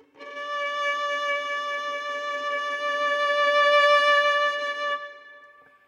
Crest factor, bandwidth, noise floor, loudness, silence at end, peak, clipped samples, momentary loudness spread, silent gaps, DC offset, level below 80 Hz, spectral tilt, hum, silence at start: 16 dB; 11 kHz; -52 dBFS; -23 LUFS; 0.4 s; -8 dBFS; under 0.1%; 12 LU; none; under 0.1%; under -90 dBFS; 1.5 dB/octave; none; 0.2 s